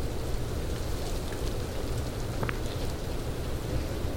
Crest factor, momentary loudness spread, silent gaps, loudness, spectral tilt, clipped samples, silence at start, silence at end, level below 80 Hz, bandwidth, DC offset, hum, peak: 18 dB; 2 LU; none; -34 LUFS; -5.5 dB/octave; under 0.1%; 0 s; 0 s; -36 dBFS; 17 kHz; 0.2%; none; -12 dBFS